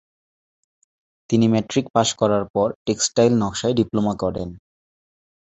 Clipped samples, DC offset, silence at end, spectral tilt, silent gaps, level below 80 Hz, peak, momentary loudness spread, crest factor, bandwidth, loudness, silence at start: under 0.1%; under 0.1%; 1 s; -5 dB/octave; 1.90-1.94 s, 2.50-2.54 s, 2.75-2.85 s; -50 dBFS; -2 dBFS; 7 LU; 20 dB; 8.2 kHz; -20 LUFS; 1.3 s